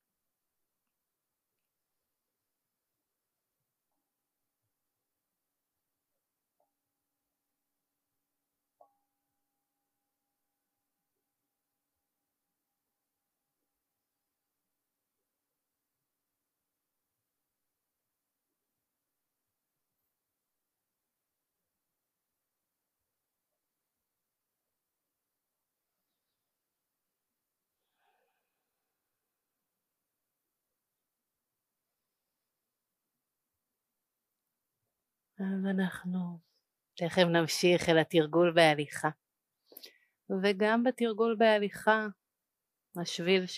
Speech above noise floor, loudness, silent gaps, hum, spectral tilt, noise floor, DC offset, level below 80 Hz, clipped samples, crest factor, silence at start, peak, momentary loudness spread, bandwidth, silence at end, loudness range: 60 dB; -29 LUFS; none; none; -5 dB/octave; -88 dBFS; under 0.1%; -80 dBFS; under 0.1%; 30 dB; 35.4 s; -8 dBFS; 13 LU; 15 kHz; 0 s; 11 LU